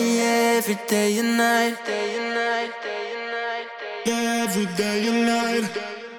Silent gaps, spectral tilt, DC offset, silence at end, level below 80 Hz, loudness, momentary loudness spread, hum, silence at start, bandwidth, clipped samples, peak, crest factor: none; -3.5 dB/octave; under 0.1%; 0 s; -70 dBFS; -23 LUFS; 10 LU; none; 0 s; 19.5 kHz; under 0.1%; -8 dBFS; 14 dB